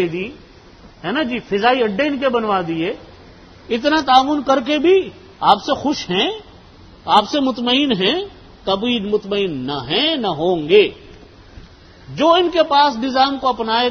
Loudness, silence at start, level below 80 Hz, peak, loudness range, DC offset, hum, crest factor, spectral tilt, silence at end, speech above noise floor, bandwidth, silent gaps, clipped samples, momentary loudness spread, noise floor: -17 LUFS; 0 s; -48 dBFS; 0 dBFS; 2 LU; under 0.1%; none; 18 dB; -5 dB/octave; 0 s; 27 dB; 9.6 kHz; none; under 0.1%; 11 LU; -43 dBFS